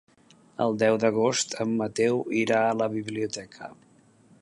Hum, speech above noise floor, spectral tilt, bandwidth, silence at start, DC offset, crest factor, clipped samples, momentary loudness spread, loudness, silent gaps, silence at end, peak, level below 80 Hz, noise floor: none; 32 dB; -4.5 dB/octave; 11 kHz; 0.6 s; under 0.1%; 18 dB; under 0.1%; 17 LU; -25 LUFS; none; 0.7 s; -10 dBFS; -68 dBFS; -58 dBFS